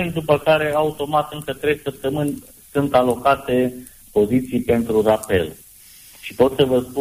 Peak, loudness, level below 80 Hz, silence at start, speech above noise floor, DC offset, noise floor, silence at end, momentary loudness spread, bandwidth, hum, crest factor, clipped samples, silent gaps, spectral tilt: -4 dBFS; -19 LUFS; -46 dBFS; 0 s; 26 dB; under 0.1%; -45 dBFS; 0 s; 9 LU; 15.5 kHz; none; 16 dB; under 0.1%; none; -6 dB/octave